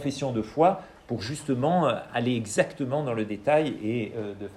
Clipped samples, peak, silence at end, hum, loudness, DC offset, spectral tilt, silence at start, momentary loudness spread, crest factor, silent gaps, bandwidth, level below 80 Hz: under 0.1%; -8 dBFS; 0 s; none; -27 LUFS; under 0.1%; -6 dB/octave; 0 s; 10 LU; 18 dB; none; 14 kHz; -60 dBFS